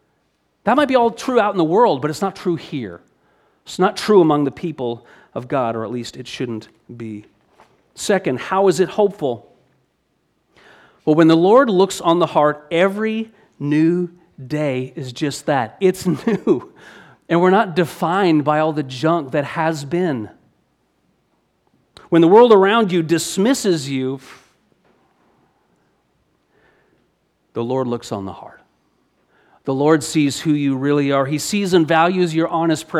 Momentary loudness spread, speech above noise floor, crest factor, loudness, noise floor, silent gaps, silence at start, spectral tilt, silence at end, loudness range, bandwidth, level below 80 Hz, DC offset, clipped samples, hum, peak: 15 LU; 49 dB; 18 dB; -17 LUFS; -66 dBFS; none; 0.65 s; -5.5 dB/octave; 0 s; 11 LU; 14.5 kHz; -62 dBFS; under 0.1%; under 0.1%; none; -2 dBFS